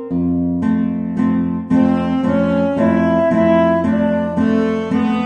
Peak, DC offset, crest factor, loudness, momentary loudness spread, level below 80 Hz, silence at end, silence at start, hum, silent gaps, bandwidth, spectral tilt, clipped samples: -2 dBFS; under 0.1%; 12 dB; -16 LUFS; 4 LU; -44 dBFS; 0 s; 0 s; none; none; 7 kHz; -9 dB/octave; under 0.1%